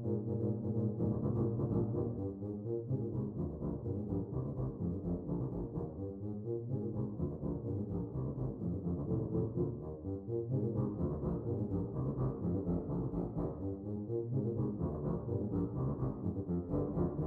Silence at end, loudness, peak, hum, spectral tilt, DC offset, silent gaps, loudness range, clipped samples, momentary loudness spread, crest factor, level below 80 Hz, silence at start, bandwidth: 0 s; -38 LUFS; -22 dBFS; none; -13.5 dB/octave; under 0.1%; none; 3 LU; under 0.1%; 5 LU; 14 dB; -52 dBFS; 0 s; 2 kHz